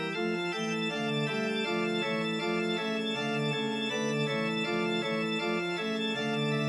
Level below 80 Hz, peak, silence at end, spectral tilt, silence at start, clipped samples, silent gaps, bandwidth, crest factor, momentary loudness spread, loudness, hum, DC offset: -82 dBFS; -18 dBFS; 0 s; -5 dB/octave; 0 s; under 0.1%; none; 13 kHz; 12 dB; 1 LU; -31 LUFS; none; under 0.1%